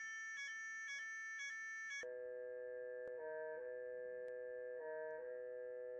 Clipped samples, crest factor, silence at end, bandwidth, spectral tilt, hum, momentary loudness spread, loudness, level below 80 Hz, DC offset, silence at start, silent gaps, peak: under 0.1%; 10 dB; 0 s; 9 kHz; -0.5 dB/octave; none; 3 LU; -48 LUFS; under -90 dBFS; under 0.1%; 0 s; none; -38 dBFS